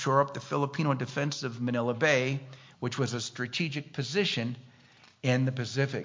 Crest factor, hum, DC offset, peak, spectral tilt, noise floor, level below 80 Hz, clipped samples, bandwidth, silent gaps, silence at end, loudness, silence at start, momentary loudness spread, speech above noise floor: 20 dB; none; under 0.1%; -10 dBFS; -5.5 dB/octave; -58 dBFS; -72 dBFS; under 0.1%; 7.6 kHz; none; 0 s; -30 LUFS; 0 s; 9 LU; 29 dB